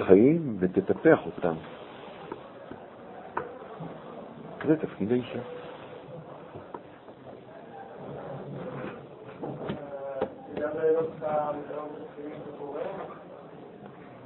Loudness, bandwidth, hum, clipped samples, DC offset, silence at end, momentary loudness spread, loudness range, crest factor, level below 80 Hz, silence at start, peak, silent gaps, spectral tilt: -30 LUFS; 4.2 kHz; none; under 0.1%; under 0.1%; 0 s; 21 LU; 12 LU; 28 dB; -66 dBFS; 0 s; -4 dBFS; none; -11 dB/octave